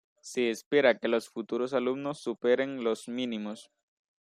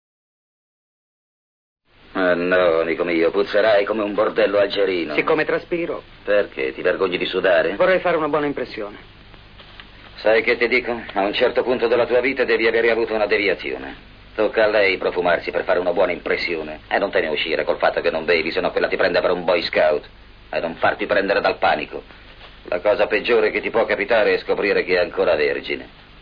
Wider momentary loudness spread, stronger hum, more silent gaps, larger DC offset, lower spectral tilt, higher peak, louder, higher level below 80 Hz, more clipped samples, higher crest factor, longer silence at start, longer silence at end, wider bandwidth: first, 11 LU vs 8 LU; neither; first, 0.66-0.71 s vs none; neither; second, -4.5 dB/octave vs -6.5 dB/octave; second, -10 dBFS vs -4 dBFS; second, -30 LUFS vs -19 LUFS; second, -78 dBFS vs -48 dBFS; neither; first, 22 dB vs 16 dB; second, 0.25 s vs 2.15 s; first, 0.6 s vs 0 s; first, 15 kHz vs 5.2 kHz